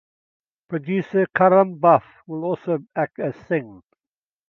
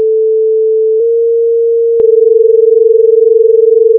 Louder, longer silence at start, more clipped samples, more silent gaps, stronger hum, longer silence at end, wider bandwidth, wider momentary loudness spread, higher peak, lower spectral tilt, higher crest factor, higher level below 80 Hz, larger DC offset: second, -21 LUFS vs -8 LUFS; first, 0.7 s vs 0 s; neither; neither; neither; first, 0.75 s vs 0 s; first, 5.8 kHz vs 0.7 kHz; first, 13 LU vs 3 LU; about the same, -2 dBFS vs 0 dBFS; about the same, -10 dB/octave vs -10.5 dB/octave; first, 20 dB vs 8 dB; second, -68 dBFS vs -62 dBFS; neither